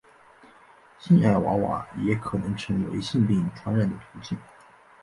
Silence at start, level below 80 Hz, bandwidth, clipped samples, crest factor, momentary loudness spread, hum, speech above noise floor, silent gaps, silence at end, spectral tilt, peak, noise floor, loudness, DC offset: 1 s; -52 dBFS; 11.5 kHz; under 0.1%; 18 dB; 16 LU; none; 29 dB; none; 0.6 s; -8 dB/octave; -8 dBFS; -54 dBFS; -25 LUFS; under 0.1%